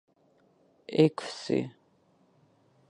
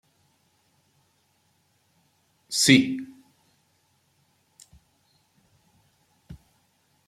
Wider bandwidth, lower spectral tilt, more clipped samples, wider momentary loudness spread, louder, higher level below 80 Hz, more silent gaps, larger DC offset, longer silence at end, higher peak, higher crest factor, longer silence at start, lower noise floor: second, 11 kHz vs 14.5 kHz; first, -6.5 dB/octave vs -3 dB/octave; neither; second, 17 LU vs 32 LU; second, -28 LUFS vs -21 LUFS; second, -78 dBFS vs -66 dBFS; neither; neither; first, 1.2 s vs 0.75 s; second, -8 dBFS vs -2 dBFS; about the same, 24 dB vs 28 dB; second, 0.9 s vs 2.5 s; about the same, -66 dBFS vs -68 dBFS